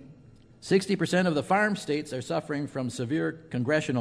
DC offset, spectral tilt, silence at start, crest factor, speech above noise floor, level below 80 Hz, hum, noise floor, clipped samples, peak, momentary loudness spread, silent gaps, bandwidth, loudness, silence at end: under 0.1%; -5.5 dB/octave; 0 s; 16 dB; 26 dB; -64 dBFS; none; -53 dBFS; under 0.1%; -10 dBFS; 8 LU; none; 11 kHz; -28 LUFS; 0 s